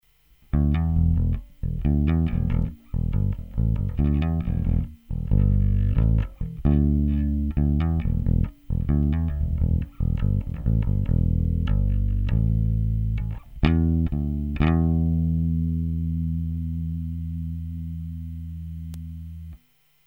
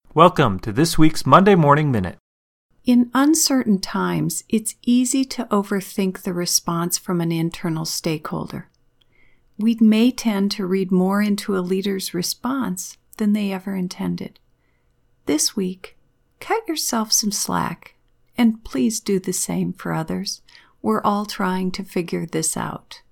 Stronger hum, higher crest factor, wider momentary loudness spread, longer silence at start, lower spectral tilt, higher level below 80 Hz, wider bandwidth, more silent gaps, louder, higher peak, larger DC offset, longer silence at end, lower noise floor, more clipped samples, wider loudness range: neither; about the same, 20 dB vs 20 dB; about the same, 11 LU vs 12 LU; first, 0.55 s vs 0.15 s; first, -10.5 dB/octave vs -4.5 dB/octave; first, -26 dBFS vs -44 dBFS; second, 4.4 kHz vs 19 kHz; second, none vs 2.20-2.69 s; second, -25 LUFS vs -20 LUFS; second, -4 dBFS vs 0 dBFS; neither; first, 0.5 s vs 0.15 s; about the same, -62 dBFS vs -62 dBFS; neither; about the same, 5 LU vs 7 LU